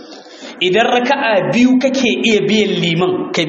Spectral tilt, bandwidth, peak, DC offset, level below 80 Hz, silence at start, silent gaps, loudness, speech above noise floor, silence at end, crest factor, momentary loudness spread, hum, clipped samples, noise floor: -4.5 dB/octave; 8 kHz; 0 dBFS; under 0.1%; -56 dBFS; 0 s; none; -13 LUFS; 20 dB; 0 s; 14 dB; 5 LU; none; under 0.1%; -34 dBFS